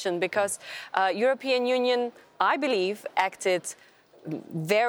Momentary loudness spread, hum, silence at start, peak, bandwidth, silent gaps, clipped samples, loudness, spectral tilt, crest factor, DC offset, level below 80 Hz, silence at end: 13 LU; none; 0 s; -6 dBFS; over 20 kHz; none; under 0.1%; -27 LUFS; -3.5 dB/octave; 20 dB; under 0.1%; -78 dBFS; 0 s